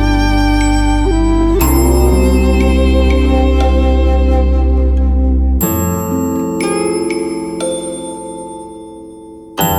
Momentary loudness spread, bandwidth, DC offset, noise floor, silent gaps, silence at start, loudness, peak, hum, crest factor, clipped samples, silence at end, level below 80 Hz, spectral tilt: 15 LU; 16.5 kHz; under 0.1%; -33 dBFS; none; 0 s; -13 LUFS; 0 dBFS; none; 12 dB; under 0.1%; 0 s; -14 dBFS; -6 dB/octave